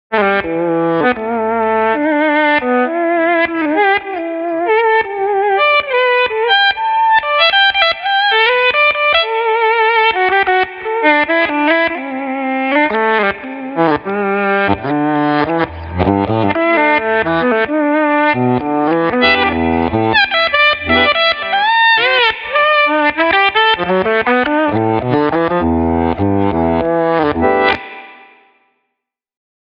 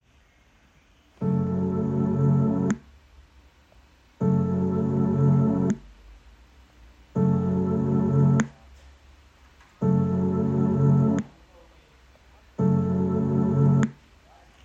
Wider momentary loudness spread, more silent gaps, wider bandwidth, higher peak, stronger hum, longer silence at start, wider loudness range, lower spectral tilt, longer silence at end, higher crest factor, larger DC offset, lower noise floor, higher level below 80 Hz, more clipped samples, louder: about the same, 6 LU vs 8 LU; neither; second, 6.4 kHz vs 7.6 kHz; first, 0 dBFS vs -6 dBFS; neither; second, 0.1 s vs 1.2 s; about the same, 4 LU vs 2 LU; second, -7.5 dB/octave vs -9.5 dB/octave; first, 1.6 s vs 0.7 s; about the same, 14 dB vs 18 dB; neither; first, -76 dBFS vs -59 dBFS; first, -40 dBFS vs -54 dBFS; neither; first, -13 LUFS vs -24 LUFS